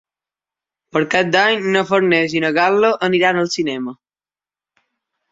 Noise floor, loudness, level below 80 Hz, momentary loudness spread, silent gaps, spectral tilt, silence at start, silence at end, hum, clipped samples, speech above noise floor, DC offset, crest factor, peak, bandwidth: under -90 dBFS; -16 LUFS; -62 dBFS; 8 LU; none; -4.5 dB/octave; 0.95 s; 1.35 s; none; under 0.1%; over 74 dB; under 0.1%; 18 dB; -2 dBFS; 7.8 kHz